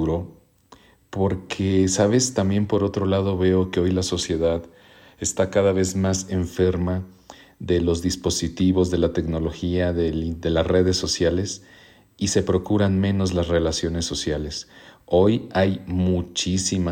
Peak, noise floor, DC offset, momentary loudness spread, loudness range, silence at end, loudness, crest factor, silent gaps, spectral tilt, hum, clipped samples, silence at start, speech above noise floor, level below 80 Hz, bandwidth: -6 dBFS; -52 dBFS; under 0.1%; 7 LU; 2 LU; 0 s; -22 LUFS; 16 dB; none; -5 dB/octave; none; under 0.1%; 0 s; 31 dB; -40 dBFS; 16 kHz